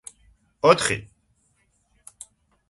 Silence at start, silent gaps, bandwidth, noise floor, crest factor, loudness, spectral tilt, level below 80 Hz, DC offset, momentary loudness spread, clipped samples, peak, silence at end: 0.65 s; none; 11.5 kHz; -67 dBFS; 26 dB; -21 LUFS; -3.5 dB/octave; -56 dBFS; under 0.1%; 27 LU; under 0.1%; -2 dBFS; 1.65 s